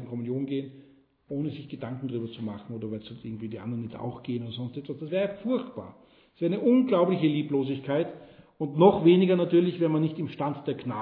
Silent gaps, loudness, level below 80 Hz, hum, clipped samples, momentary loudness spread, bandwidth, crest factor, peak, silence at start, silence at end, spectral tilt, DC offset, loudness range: none; -27 LUFS; -66 dBFS; none; under 0.1%; 16 LU; 4.5 kHz; 20 dB; -6 dBFS; 0 s; 0 s; -11 dB/octave; under 0.1%; 12 LU